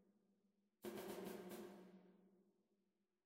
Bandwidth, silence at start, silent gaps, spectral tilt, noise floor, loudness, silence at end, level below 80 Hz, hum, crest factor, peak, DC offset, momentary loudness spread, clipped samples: 16 kHz; 0 s; none; -5 dB/octave; -89 dBFS; -55 LUFS; 0.75 s; under -90 dBFS; none; 18 dB; -40 dBFS; under 0.1%; 13 LU; under 0.1%